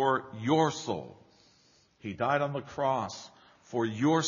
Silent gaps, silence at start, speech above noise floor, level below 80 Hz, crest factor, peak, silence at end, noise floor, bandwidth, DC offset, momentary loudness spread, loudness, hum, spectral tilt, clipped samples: none; 0 s; 35 dB; -70 dBFS; 18 dB; -12 dBFS; 0 s; -65 dBFS; 7.2 kHz; under 0.1%; 17 LU; -31 LUFS; none; -4.5 dB/octave; under 0.1%